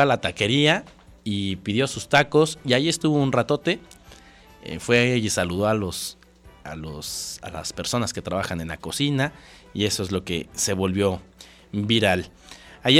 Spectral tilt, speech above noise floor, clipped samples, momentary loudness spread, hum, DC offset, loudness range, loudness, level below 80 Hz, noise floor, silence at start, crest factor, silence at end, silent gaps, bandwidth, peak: -4 dB/octave; 26 dB; under 0.1%; 14 LU; none; under 0.1%; 6 LU; -23 LUFS; -50 dBFS; -49 dBFS; 0 s; 20 dB; 0 s; none; 16.5 kHz; -4 dBFS